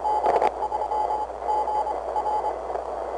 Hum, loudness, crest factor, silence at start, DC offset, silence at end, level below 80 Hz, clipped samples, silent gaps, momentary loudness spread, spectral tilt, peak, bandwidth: 60 Hz at -50 dBFS; -26 LUFS; 14 dB; 0 s; under 0.1%; 0 s; -50 dBFS; under 0.1%; none; 7 LU; -5 dB/octave; -12 dBFS; 10 kHz